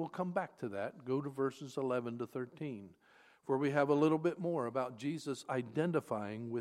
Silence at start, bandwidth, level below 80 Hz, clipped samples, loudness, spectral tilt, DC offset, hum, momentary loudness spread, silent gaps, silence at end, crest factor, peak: 0 s; 14 kHz; -84 dBFS; under 0.1%; -37 LUFS; -7 dB/octave; under 0.1%; none; 11 LU; none; 0 s; 20 dB; -16 dBFS